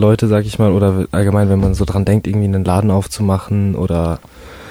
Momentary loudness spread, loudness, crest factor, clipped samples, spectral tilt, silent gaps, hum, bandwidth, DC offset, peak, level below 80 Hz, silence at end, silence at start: 4 LU; -15 LUFS; 12 dB; under 0.1%; -8 dB/octave; none; none; 14.5 kHz; under 0.1%; -2 dBFS; -30 dBFS; 0 s; 0 s